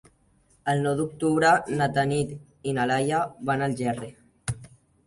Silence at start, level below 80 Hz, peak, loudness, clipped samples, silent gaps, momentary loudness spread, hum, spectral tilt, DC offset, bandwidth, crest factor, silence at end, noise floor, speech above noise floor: 0.65 s; -56 dBFS; -8 dBFS; -26 LUFS; under 0.1%; none; 14 LU; none; -5.5 dB/octave; under 0.1%; 11.5 kHz; 18 dB; 0.4 s; -63 dBFS; 38 dB